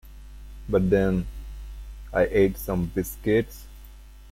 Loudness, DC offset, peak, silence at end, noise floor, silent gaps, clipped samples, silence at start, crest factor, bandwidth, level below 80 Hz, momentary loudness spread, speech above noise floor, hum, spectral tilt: -24 LUFS; under 0.1%; -8 dBFS; 0 s; -45 dBFS; none; under 0.1%; 0.05 s; 18 dB; 16.5 kHz; -38 dBFS; 21 LU; 22 dB; none; -7 dB/octave